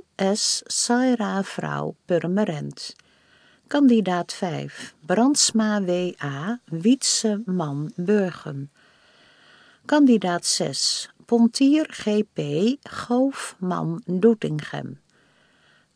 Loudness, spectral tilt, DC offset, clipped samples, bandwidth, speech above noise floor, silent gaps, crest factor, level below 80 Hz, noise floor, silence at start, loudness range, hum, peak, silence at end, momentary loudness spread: -22 LUFS; -4 dB/octave; under 0.1%; under 0.1%; 10.5 kHz; 38 dB; none; 18 dB; -70 dBFS; -60 dBFS; 0.2 s; 4 LU; none; -6 dBFS; 1 s; 14 LU